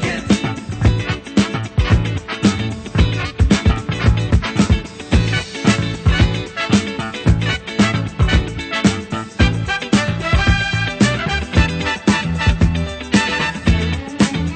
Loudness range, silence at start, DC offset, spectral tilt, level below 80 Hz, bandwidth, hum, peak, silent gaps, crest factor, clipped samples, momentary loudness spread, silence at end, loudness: 1 LU; 0 s; under 0.1%; -5.5 dB/octave; -24 dBFS; 9.2 kHz; none; 0 dBFS; none; 16 dB; under 0.1%; 4 LU; 0 s; -17 LUFS